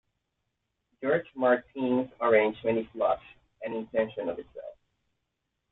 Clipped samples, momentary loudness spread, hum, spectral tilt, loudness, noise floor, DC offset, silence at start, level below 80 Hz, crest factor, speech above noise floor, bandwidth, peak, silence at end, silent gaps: under 0.1%; 16 LU; none; -9 dB/octave; -28 LUFS; -82 dBFS; under 0.1%; 1 s; -66 dBFS; 20 dB; 54 dB; 4.1 kHz; -10 dBFS; 1 s; none